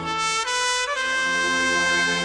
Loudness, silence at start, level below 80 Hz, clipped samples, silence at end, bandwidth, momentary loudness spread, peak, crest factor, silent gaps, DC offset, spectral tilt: -21 LUFS; 0 s; -54 dBFS; under 0.1%; 0 s; 10 kHz; 3 LU; -8 dBFS; 14 dB; none; under 0.1%; -1 dB/octave